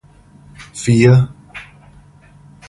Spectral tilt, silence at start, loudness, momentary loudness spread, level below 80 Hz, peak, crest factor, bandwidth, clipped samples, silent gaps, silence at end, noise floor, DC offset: -7 dB/octave; 0.6 s; -13 LUFS; 24 LU; -44 dBFS; 0 dBFS; 18 dB; 11.5 kHz; under 0.1%; none; 1.05 s; -45 dBFS; under 0.1%